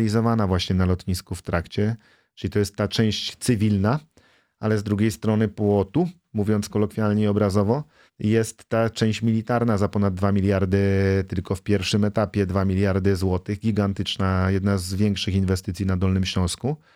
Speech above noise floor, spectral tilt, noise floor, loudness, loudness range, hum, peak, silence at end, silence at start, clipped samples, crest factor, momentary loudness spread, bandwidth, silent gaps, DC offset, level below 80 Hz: 37 dB; -6.5 dB/octave; -59 dBFS; -23 LUFS; 2 LU; none; -6 dBFS; 0.2 s; 0 s; under 0.1%; 16 dB; 6 LU; 15 kHz; none; under 0.1%; -48 dBFS